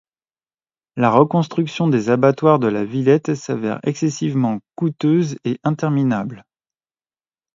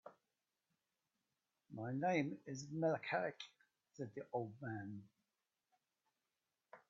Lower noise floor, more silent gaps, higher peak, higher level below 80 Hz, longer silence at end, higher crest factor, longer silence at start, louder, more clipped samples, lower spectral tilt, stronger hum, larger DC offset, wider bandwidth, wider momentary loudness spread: about the same, under -90 dBFS vs under -90 dBFS; neither; first, 0 dBFS vs -26 dBFS; first, -62 dBFS vs -88 dBFS; first, 1.15 s vs 0.1 s; about the same, 18 dB vs 22 dB; first, 0.95 s vs 0.05 s; first, -18 LUFS vs -43 LUFS; neither; first, -7.5 dB/octave vs -5.5 dB/octave; neither; neither; about the same, 7.6 kHz vs 7.2 kHz; second, 8 LU vs 17 LU